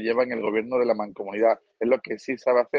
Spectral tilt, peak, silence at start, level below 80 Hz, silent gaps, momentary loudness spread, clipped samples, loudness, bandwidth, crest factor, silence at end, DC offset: -6 dB/octave; -8 dBFS; 0 s; -70 dBFS; none; 5 LU; under 0.1%; -25 LUFS; 7.4 kHz; 16 dB; 0 s; under 0.1%